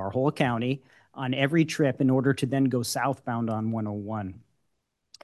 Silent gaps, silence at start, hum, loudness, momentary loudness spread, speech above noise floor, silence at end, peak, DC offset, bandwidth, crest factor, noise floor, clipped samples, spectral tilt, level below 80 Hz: none; 0 s; none; -27 LUFS; 11 LU; 52 dB; 0.85 s; -8 dBFS; under 0.1%; 12.5 kHz; 18 dB; -78 dBFS; under 0.1%; -6 dB/octave; -60 dBFS